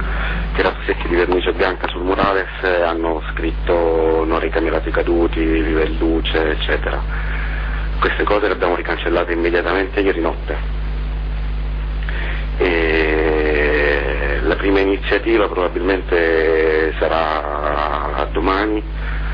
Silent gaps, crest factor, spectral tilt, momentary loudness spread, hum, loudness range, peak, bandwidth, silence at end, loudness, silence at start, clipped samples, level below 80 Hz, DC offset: none; 12 dB; -8.5 dB/octave; 8 LU; 50 Hz at -25 dBFS; 3 LU; -6 dBFS; 5.2 kHz; 0 s; -18 LUFS; 0 s; under 0.1%; -24 dBFS; under 0.1%